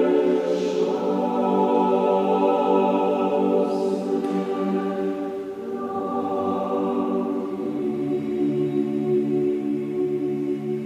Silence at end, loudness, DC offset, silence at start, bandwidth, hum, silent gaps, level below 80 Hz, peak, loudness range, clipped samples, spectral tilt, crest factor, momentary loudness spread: 0 s; -23 LUFS; under 0.1%; 0 s; 9.6 kHz; none; none; -66 dBFS; -8 dBFS; 5 LU; under 0.1%; -8 dB/octave; 14 dB; 7 LU